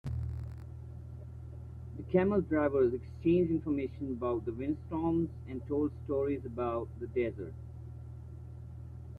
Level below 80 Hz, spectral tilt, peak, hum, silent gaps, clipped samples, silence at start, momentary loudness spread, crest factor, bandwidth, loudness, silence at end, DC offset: -52 dBFS; -10.5 dB/octave; -14 dBFS; none; none; under 0.1%; 0.05 s; 18 LU; 20 dB; 4.7 kHz; -33 LUFS; 0 s; under 0.1%